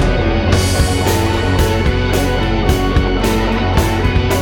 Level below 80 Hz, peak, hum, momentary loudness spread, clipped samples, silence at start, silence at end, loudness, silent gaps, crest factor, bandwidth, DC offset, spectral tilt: -20 dBFS; 0 dBFS; none; 1 LU; under 0.1%; 0 s; 0 s; -15 LUFS; none; 12 dB; 19.5 kHz; under 0.1%; -5.5 dB/octave